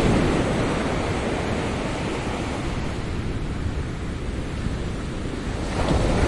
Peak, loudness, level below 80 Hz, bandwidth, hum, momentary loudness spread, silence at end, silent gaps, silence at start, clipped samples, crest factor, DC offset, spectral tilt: -8 dBFS; -26 LUFS; -30 dBFS; 11.5 kHz; none; 8 LU; 0 s; none; 0 s; under 0.1%; 16 dB; under 0.1%; -6 dB/octave